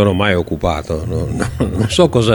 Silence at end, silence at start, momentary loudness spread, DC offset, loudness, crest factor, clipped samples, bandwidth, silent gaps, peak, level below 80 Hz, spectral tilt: 0 s; 0 s; 8 LU; under 0.1%; -16 LUFS; 14 dB; under 0.1%; 19.5 kHz; none; 0 dBFS; -30 dBFS; -6 dB/octave